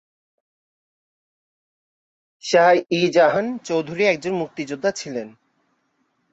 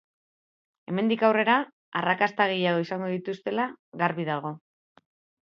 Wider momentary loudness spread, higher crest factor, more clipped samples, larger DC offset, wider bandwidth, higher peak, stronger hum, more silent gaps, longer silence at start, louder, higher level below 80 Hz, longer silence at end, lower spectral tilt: first, 15 LU vs 10 LU; about the same, 20 dB vs 22 dB; neither; neither; first, 8 kHz vs 6.8 kHz; about the same, -4 dBFS vs -6 dBFS; neither; second, none vs 1.73-1.92 s, 3.79-3.92 s; first, 2.45 s vs 0.9 s; first, -20 LUFS vs -26 LUFS; first, -68 dBFS vs -76 dBFS; first, 1.05 s vs 0.85 s; second, -4.5 dB/octave vs -7 dB/octave